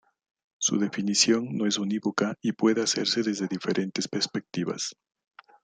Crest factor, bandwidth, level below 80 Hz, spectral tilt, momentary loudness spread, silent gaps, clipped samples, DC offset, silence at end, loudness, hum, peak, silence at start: 20 dB; 10 kHz; -72 dBFS; -3.5 dB/octave; 8 LU; none; under 0.1%; under 0.1%; 0.7 s; -26 LUFS; none; -8 dBFS; 0.6 s